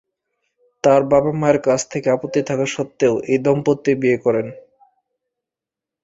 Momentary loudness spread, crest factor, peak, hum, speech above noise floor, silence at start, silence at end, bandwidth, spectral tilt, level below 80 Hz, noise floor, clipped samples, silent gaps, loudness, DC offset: 6 LU; 18 dB; -2 dBFS; none; 70 dB; 0.85 s; 1.45 s; 8 kHz; -6 dB/octave; -56 dBFS; -87 dBFS; under 0.1%; none; -18 LUFS; under 0.1%